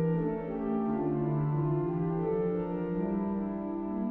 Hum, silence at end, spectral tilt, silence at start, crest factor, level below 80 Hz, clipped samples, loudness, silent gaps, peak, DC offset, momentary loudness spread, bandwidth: none; 0 s; -12.5 dB/octave; 0 s; 10 dB; -54 dBFS; under 0.1%; -32 LUFS; none; -20 dBFS; under 0.1%; 4 LU; 3.4 kHz